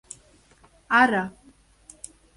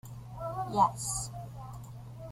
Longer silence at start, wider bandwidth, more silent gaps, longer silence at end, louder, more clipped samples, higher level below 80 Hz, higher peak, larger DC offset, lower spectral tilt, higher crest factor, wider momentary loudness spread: first, 0.9 s vs 0.05 s; second, 11.5 kHz vs 16 kHz; neither; first, 1.05 s vs 0 s; first, -21 LUFS vs -32 LUFS; neither; second, -60 dBFS vs -54 dBFS; first, -6 dBFS vs -12 dBFS; neither; about the same, -4 dB/octave vs -4.5 dB/octave; about the same, 22 dB vs 22 dB; first, 25 LU vs 18 LU